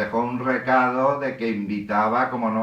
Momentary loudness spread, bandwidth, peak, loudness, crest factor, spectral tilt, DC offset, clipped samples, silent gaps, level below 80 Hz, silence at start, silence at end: 6 LU; 8.2 kHz; -8 dBFS; -22 LUFS; 14 dB; -7.5 dB/octave; under 0.1%; under 0.1%; none; -60 dBFS; 0 s; 0 s